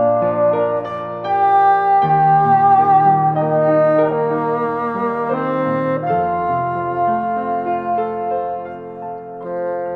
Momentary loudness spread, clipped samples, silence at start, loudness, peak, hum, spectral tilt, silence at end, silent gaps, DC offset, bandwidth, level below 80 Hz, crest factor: 12 LU; under 0.1%; 0 s; -16 LUFS; -2 dBFS; none; -9.5 dB/octave; 0 s; none; under 0.1%; 4.7 kHz; -56 dBFS; 14 dB